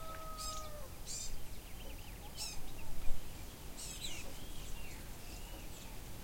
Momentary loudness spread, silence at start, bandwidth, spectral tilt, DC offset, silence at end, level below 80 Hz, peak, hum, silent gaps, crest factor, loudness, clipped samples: 7 LU; 0 s; 16.5 kHz; -2.5 dB/octave; under 0.1%; 0 s; -46 dBFS; -18 dBFS; none; none; 20 dB; -47 LUFS; under 0.1%